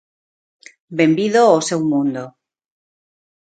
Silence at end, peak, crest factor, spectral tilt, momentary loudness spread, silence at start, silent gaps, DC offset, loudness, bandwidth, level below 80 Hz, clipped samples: 1.2 s; 0 dBFS; 18 dB; -5 dB/octave; 16 LU; 0.9 s; none; under 0.1%; -16 LUFS; 9.2 kHz; -66 dBFS; under 0.1%